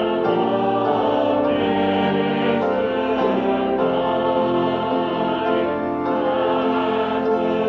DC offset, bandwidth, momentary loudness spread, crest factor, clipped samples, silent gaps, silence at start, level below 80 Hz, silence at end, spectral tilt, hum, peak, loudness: under 0.1%; 6.4 kHz; 2 LU; 12 dB; under 0.1%; none; 0 s; -52 dBFS; 0 s; -8 dB/octave; none; -6 dBFS; -20 LUFS